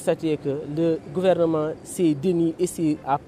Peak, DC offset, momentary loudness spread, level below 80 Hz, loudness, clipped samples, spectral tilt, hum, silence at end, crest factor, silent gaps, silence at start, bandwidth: -8 dBFS; under 0.1%; 5 LU; -56 dBFS; -23 LUFS; under 0.1%; -6.5 dB/octave; none; 0 s; 14 dB; none; 0 s; 15 kHz